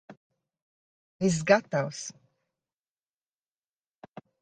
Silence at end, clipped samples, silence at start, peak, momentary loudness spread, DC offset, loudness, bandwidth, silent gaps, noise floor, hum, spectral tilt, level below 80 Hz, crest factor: 2.3 s; under 0.1%; 0.1 s; -6 dBFS; 16 LU; under 0.1%; -27 LUFS; 9.8 kHz; 0.17-0.30 s, 0.62-1.20 s; under -90 dBFS; none; -5 dB/octave; -68 dBFS; 26 dB